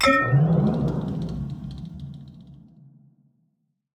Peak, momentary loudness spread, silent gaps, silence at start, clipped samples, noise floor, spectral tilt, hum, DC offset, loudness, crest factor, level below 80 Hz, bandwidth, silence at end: -6 dBFS; 21 LU; none; 0 s; under 0.1%; -72 dBFS; -6.5 dB/octave; none; under 0.1%; -23 LUFS; 20 dB; -46 dBFS; 12 kHz; 1.4 s